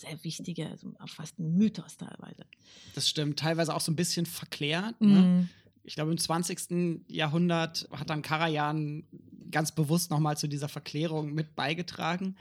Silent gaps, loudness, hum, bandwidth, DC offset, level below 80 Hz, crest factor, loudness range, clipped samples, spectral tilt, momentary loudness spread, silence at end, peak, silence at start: none; -30 LUFS; none; 16 kHz; under 0.1%; -72 dBFS; 18 dB; 4 LU; under 0.1%; -5 dB/octave; 16 LU; 0.05 s; -12 dBFS; 0 s